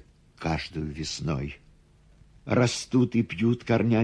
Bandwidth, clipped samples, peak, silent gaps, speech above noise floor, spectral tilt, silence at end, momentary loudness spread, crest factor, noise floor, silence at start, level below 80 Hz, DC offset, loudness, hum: 11 kHz; under 0.1%; -10 dBFS; none; 32 dB; -6 dB/octave; 0 s; 11 LU; 18 dB; -57 dBFS; 0.4 s; -48 dBFS; under 0.1%; -27 LUFS; none